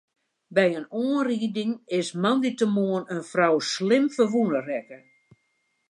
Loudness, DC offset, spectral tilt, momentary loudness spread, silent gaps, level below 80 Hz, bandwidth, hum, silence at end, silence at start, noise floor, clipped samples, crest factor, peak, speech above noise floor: -25 LUFS; under 0.1%; -5.5 dB/octave; 7 LU; none; -78 dBFS; 11 kHz; none; 0.95 s; 0.5 s; -73 dBFS; under 0.1%; 18 dB; -6 dBFS; 49 dB